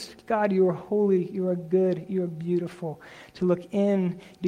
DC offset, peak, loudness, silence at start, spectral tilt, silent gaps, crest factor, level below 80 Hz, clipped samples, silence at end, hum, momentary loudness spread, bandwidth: under 0.1%; -12 dBFS; -26 LUFS; 0 s; -8.5 dB/octave; none; 14 dB; -66 dBFS; under 0.1%; 0 s; none; 11 LU; 10 kHz